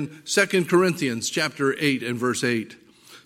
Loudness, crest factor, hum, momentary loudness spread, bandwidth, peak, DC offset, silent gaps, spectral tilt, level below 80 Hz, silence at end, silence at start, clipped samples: -23 LUFS; 20 dB; none; 6 LU; 16 kHz; -4 dBFS; under 0.1%; none; -4 dB/octave; -70 dBFS; 0.1 s; 0 s; under 0.1%